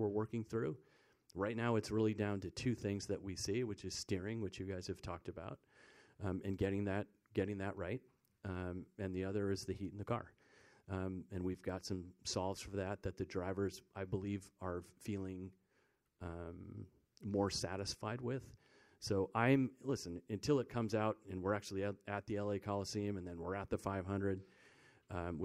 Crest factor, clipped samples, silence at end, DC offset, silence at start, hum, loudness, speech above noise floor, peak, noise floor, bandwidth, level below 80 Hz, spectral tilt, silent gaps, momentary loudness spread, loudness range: 24 dB; under 0.1%; 0 s; under 0.1%; 0 s; none; -42 LUFS; 38 dB; -18 dBFS; -79 dBFS; 14.5 kHz; -66 dBFS; -6 dB/octave; none; 12 LU; 6 LU